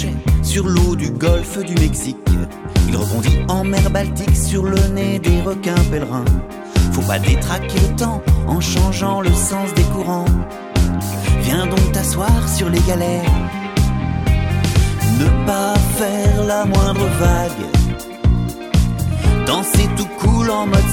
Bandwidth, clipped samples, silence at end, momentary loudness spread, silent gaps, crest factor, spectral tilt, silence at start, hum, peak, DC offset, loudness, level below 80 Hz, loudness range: 17.5 kHz; under 0.1%; 0 s; 4 LU; none; 14 dB; -5.5 dB/octave; 0 s; none; 0 dBFS; under 0.1%; -17 LUFS; -20 dBFS; 1 LU